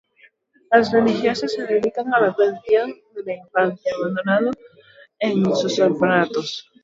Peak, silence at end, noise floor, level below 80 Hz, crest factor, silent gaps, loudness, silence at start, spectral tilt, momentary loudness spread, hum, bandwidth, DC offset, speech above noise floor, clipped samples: 0 dBFS; 0.2 s; -56 dBFS; -62 dBFS; 20 dB; none; -20 LUFS; 0.7 s; -5.5 dB/octave; 10 LU; none; 7.8 kHz; under 0.1%; 37 dB; under 0.1%